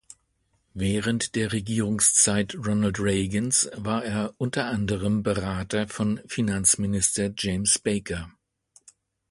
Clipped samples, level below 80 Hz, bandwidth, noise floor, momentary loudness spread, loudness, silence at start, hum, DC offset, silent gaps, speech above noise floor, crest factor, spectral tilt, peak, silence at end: under 0.1%; -48 dBFS; 12 kHz; -71 dBFS; 8 LU; -24 LUFS; 0.75 s; none; under 0.1%; none; 46 dB; 20 dB; -3.5 dB/octave; -6 dBFS; 1 s